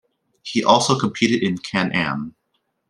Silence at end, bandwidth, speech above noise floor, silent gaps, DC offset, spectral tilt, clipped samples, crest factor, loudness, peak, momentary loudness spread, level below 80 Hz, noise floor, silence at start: 0.6 s; 12 kHz; 52 dB; none; under 0.1%; -4.5 dB/octave; under 0.1%; 20 dB; -19 LUFS; -2 dBFS; 13 LU; -60 dBFS; -71 dBFS; 0.45 s